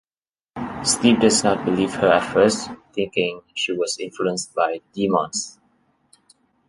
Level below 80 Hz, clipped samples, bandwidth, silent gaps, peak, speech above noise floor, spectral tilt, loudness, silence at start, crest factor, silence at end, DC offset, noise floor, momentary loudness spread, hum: -56 dBFS; under 0.1%; 11.5 kHz; none; -2 dBFS; over 70 dB; -3.5 dB/octave; -20 LUFS; 0.55 s; 20 dB; 1.2 s; under 0.1%; under -90 dBFS; 12 LU; none